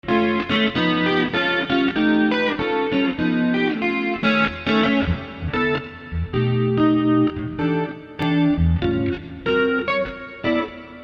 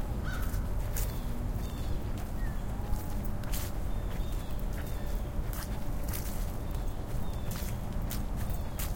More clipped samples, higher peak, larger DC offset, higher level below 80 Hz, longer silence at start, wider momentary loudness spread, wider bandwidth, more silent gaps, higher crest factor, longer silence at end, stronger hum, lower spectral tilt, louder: neither; first, -6 dBFS vs -18 dBFS; neither; about the same, -38 dBFS vs -36 dBFS; about the same, 0.05 s vs 0 s; first, 8 LU vs 3 LU; second, 6.8 kHz vs 17 kHz; neither; about the same, 14 dB vs 14 dB; about the same, 0 s vs 0 s; neither; first, -7.5 dB/octave vs -5.5 dB/octave; first, -20 LUFS vs -37 LUFS